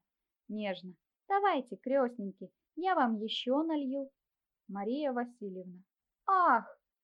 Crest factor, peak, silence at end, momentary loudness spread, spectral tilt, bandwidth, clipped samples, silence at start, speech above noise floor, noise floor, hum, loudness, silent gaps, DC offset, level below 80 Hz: 18 dB; -16 dBFS; 0.3 s; 19 LU; -6.5 dB/octave; 9.6 kHz; under 0.1%; 0.5 s; 33 dB; -66 dBFS; none; -33 LUFS; none; under 0.1%; under -90 dBFS